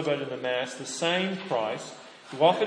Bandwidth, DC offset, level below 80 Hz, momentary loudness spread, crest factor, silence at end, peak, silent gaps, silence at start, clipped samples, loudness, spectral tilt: 10.5 kHz; under 0.1%; -82 dBFS; 17 LU; 20 dB; 0 s; -8 dBFS; none; 0 s; under 0.1%; -28 LUFS; -4 dB/octave